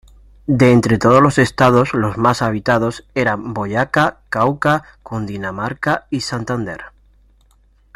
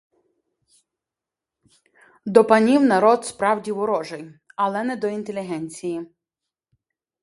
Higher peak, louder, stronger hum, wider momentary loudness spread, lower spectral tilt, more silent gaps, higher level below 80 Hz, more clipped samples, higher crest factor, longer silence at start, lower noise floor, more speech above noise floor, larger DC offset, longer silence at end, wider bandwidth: about the same, 0 dBFS vs 0 dBFS; first, -16 LUFS vs -20 LUFS; neither; second, 12 LU vs 19 LU; about the same, -6.5 dB/octave vs -5.5 dB/octave; neither; first, -44 dBFS vs -68 dBFS; neither; second, 16 dB vs 22 dB; second, 0.5 s vs 2.25 s; second, -53 dBFS vs -88 dBFS; second, 37 dB vs 68 dB; neither; about the same, 1.05 s vs 1.15 s; first, 15.5 kHz vs 11.5 kHz